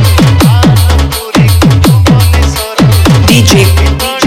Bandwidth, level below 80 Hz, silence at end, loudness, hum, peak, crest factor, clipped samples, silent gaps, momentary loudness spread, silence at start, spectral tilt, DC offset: 16.5 kHz; -14 dBFS; 0 s; -6 LUFS; none; 0 dBFS; 6 dB; 0.7%; none; 5 LU; 0 s; -5.5 dB/octave; under 0.1%